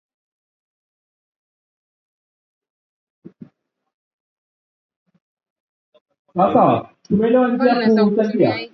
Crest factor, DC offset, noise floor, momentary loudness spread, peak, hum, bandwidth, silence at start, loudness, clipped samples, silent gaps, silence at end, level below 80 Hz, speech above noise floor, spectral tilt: 20 dB; under 0.1%; -58 dBFS; 7 LU; -2 dBFS; none; 6 kHz; 3.25 s; -17 LUFS; under 0.1%; 3.94-4.89 s, 4.96-5.06 s, 5.22-5.37 s, 5.50-5.92 s, 6.01-6.05 s, 6.19-6.25 s; 0.05 s; -60 dBFS; 42 dB; -8.5 dB/octave